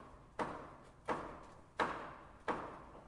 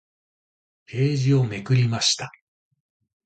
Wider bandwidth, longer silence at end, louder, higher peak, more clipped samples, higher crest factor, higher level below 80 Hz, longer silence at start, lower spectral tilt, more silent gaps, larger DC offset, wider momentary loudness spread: first, 11.5 kHz vs 9.2 kHz; second, 0 s vs 0.95 s; second, -44 LUFS vs -22 LUFS; second, -22 dBFS vs -8 dBFS; neither; first, 22 dB vs 16 dB; second, -64 dBFS vs -58 dBFS; second, 0 s vs 0.9 s; about the same, -5 dB/octave vs -5 dB/octave; neither; neither; about the same, 12 LU vs 10 LU